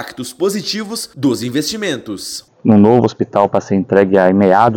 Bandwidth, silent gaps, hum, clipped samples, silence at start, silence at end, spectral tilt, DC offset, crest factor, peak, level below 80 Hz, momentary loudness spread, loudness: 17.5 kHz; none; none; 0.6%; 0 s; 0 s; -5.5 dB/octave; under 0.1%; 14 dB; 0 dBFS; -54 dBFS; 13 LU; -14 LUFS